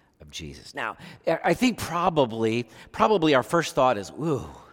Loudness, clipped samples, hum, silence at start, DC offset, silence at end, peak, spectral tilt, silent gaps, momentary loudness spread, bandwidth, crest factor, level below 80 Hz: -24 LUFS; under 0.1%; none; 0.2 s; under 0.1%; 0.15 s; -6 dBFS; -5 dB/octave; none; 17 LU; 18 kHz; 20 dB; -54 dBFS